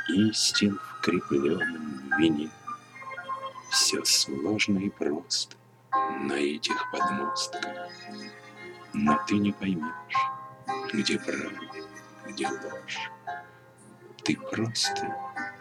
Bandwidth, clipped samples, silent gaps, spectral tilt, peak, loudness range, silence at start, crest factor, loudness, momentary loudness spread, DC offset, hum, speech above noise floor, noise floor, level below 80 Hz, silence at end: 16.5 kHz; under 0.1%; none; -3 dB/octave; -8 dBFS; 7 LU; 0 s; 20 dB; -28 LUFS; 17 LU; under 0.1%; none; 24 dB; -53 dBFS; -66 dBFS; 0 s